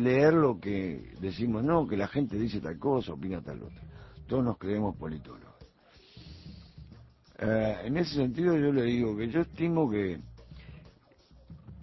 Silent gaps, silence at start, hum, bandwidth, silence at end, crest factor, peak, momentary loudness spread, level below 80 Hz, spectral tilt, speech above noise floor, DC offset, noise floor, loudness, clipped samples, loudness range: none; 0 s; none; 6 kHz; 0 s; 20 dB; -12 dBFS; 23 LU; -52 dBFS; -8.5 dB/octave; 30 dB; under 0.1%; -59 dBFS; -30 LUFS; under 0.1%; 8 LU